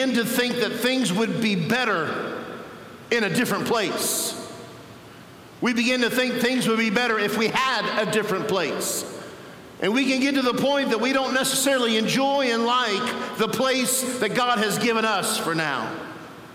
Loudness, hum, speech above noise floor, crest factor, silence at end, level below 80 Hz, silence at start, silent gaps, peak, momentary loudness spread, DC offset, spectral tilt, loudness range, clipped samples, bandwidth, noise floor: -22 LUFS; none; 22 dB; 18 dB; 0 s; -66 dBFS; 0 s; none; -6 dBFS; 14 LU; under 0.1%; -3 dB/octave; 3 LU; under 0.1%; 17 kHz; -44 dBFS